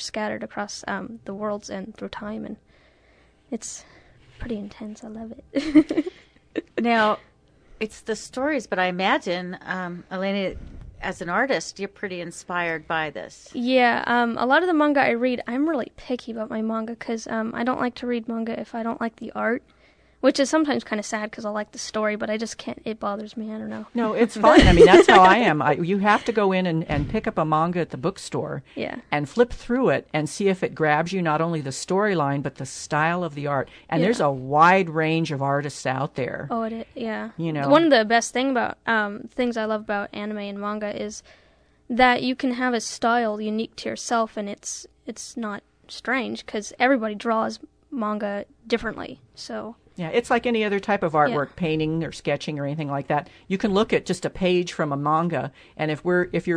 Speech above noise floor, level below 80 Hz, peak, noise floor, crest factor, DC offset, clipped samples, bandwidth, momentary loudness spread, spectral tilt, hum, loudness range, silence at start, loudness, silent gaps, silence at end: 35 dB; -42 dBFS; 0 dBFS; -57 dBFS; 22 dB; under 0.1%; under 0.1%; 11 kHz; 14 LU; -5 dB/octave; none; 10 LU; 0 s; -23 LUFS; none; 0 s